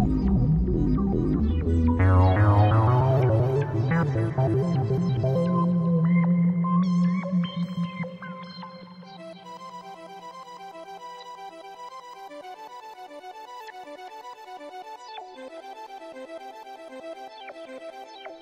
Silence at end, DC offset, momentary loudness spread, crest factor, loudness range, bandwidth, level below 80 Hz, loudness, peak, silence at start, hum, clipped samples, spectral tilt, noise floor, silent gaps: 0.05 s; under 0.1%; 21 LU; 18 dB; 19 LU; 7.2 kHz; -38 dBFS; -23 LUFS; -8 dBFS; 0 s; none; under 0.1%; -9 dB/octave; -43 dBFS; none